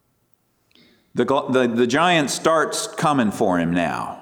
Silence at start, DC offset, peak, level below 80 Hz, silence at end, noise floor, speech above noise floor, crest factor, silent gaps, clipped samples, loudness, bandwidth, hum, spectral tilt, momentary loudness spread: 1.15 s; under 0.1%; -6 dBFS; -58 dBFS; 0 s; -64 dBFS; 45 dB; 16 dB; none; under 0.1%; -20 LUFS; 18.5 kHz; none; -4.5 dB/octave; 6 LU